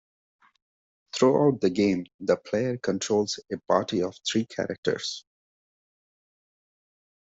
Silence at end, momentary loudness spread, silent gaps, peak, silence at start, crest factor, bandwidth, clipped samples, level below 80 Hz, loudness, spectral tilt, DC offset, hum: 2.15 s; 9 LU; 2.14-2.19 s, 4.78-4.83 s; -8 dBFS; 1.15 s; 20 dB; 8 kHz; under 0.1%; -68 dBFS; -26 LUFS; -5 dB/octave; under 0.1%; none